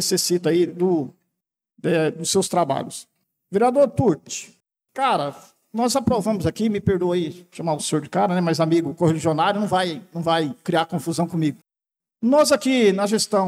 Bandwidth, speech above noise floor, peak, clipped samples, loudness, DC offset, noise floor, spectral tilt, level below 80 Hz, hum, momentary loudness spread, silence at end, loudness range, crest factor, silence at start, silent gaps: 16 kHz; 66 dB; -8 dBFS; under 0.1%; -21 LUFS; under 0.1%; -87 dBFS; -5 dB/octave; -60 dBFS; none; 10 LU; 0 s; 2 LU; 14 dB; 0 s; none